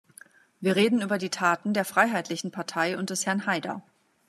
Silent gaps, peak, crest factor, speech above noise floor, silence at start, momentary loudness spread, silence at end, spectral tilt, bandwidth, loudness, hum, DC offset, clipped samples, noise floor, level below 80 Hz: none; -6 dBFS; 22 dB; 28 dB; 0.6 s; 9 LU; 0.5 s; -4 dB/octave; 14 kHz; -26 LUFS; none; under 0.1%; under 0.1%; -54 dBFS; -80 dBFS